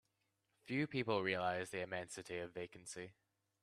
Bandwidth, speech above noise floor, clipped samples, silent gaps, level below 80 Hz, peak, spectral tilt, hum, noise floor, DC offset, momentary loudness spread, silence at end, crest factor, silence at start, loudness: 13 kHz; 42 dB; under 0.1%; none; -78 dBFS; -22 dBFS; -4.5 dB/octave; none; -85 dBFS; under 0.1%; 13 LU; 0.5 s; 20 dB; 0.65 s; -42 LUFS